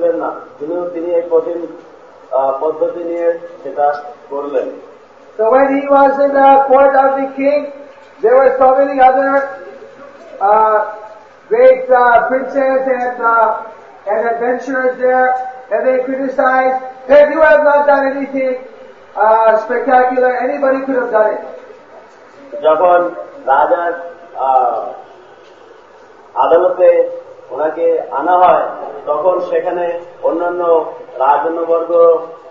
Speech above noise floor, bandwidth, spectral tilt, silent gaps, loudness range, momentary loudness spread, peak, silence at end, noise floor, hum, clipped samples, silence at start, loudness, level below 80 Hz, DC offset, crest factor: 28 dB; 6.4 kHz; -6 dB/octave; none; 6 LU; 15 LU; 0 dBFS; 0 s; -40 dBFS; none; under 0.1%; 0 s; -13 LUFS; -56 dBFS; 0.2%; 14 dB